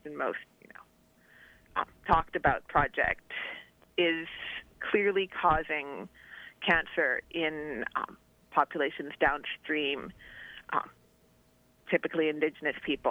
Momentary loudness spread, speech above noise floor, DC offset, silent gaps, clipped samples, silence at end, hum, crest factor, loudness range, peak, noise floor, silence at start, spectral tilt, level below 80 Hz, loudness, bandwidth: 15 LU; 34 dB; under 0.1%; none; under 0.1%; 0 s; none; 22 dB; 4 LU; -10 dBFS; -65 dBFS; 0.05 s; -6 dB/octave; -52 dBFS; -31 LUFS; 16.5 kHz